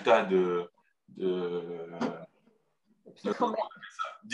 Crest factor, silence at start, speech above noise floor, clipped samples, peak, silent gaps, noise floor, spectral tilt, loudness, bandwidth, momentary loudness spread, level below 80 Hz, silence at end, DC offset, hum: 22 dB; 0 s; 42 dB; under 0.1%; -10 dBFS; none; -72 dBFS; -6 dB/octave; -32 LUFS; 8.8 kHz; 13 LU; -82 dBFS; 0 s; under 0.1%; none